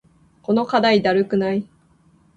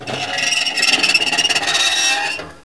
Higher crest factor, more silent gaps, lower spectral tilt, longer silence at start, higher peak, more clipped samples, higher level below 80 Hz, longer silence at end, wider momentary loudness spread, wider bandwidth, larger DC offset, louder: about the same, 16 dB vs 18 dB; neither; first, -6.5 dB/octave vs 0 dB/octave; first, 0.5 s vs 0 s; second, -6 dBFS vs 0 dBFS; neither; about the same, -58 dBFS vs -58 dBFS; first, 0.7 s vs 0.05 s; first, 9 LU vs 6 LU; second, 8 kHz vs 11 kHz; second, under 0.1% vs 0.5%; second, -19 LUFS vs -14 LUFS